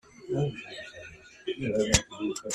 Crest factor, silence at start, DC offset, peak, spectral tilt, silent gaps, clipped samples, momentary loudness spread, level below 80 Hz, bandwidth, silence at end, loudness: 28 dB; 0.2 s; under 0.1%; -4 dBFS; -4 dB/octave; none; under 0.1%; 19 LU; -46 dBFS; 14 kHz; 0 s; -30 LUFS